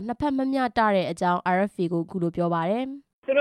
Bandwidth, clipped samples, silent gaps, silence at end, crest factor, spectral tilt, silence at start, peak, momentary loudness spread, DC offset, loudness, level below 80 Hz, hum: 11 kHz; under 0.1%; 3.13-3.22 s; 0 s; 16 dB; -7 dB/octave; 0 s; -8 dBFS; 6 LU; under 0.1%; -25 LUFS; -58 dBFS; none